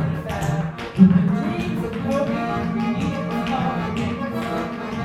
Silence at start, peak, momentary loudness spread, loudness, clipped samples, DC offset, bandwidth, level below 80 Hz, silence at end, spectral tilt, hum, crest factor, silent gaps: 0 s; 0 dBFS; 10 LU; -22 LUFS; under 0.1%; under 0.1%; 13 kHz; -44 dBFS; 0 s; -7.5 dB/octave; none; 20 dB; none